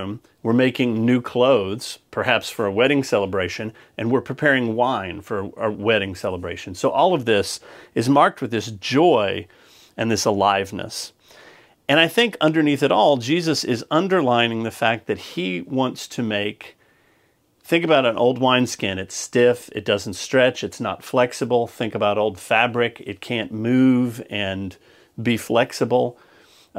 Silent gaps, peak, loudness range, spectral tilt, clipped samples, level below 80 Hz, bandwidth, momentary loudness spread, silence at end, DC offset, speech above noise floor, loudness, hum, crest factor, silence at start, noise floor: none; 0 dBFS; 3 LU; -5 dB/octave; under 0.1%; -62 dBFS; 16 kHz; 11 LU; 0 s; under 0.1%; 41 dB; -20 LUFS; none; 20 dB; 0 s; -62 dBFS